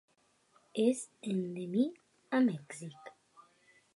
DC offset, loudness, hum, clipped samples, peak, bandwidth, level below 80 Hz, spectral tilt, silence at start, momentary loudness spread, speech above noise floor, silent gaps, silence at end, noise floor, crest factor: under 0.1%; -34 LUFS; none; under 0.1%; -18 dBFS; 11.5 kHz; -88 dBFS; -6 dB/octave; 0.75 s; 17 LU; 37 dB; none; 0.55 s; -70 dBFS; 18 dB